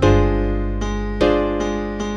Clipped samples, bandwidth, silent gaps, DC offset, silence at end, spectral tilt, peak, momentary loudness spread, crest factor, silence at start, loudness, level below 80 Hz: under 0.1%; 7.8 kHz; none; under 0.1%; 0 s; -7 dB/octave; -2 dBFS; 7 LU; 16 dB; 0 s; -20 LUFS; -24 dBFS